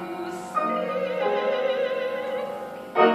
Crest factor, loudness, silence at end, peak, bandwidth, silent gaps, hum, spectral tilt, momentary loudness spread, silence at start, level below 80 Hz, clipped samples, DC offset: 20 dB; -26 LUFS; 0 s; -4 dBFS; 14.5 kHz; none; none; -5 dB/octave; 9 LU; 0 s; -74 dBFS; under 0.1%; under 0.1%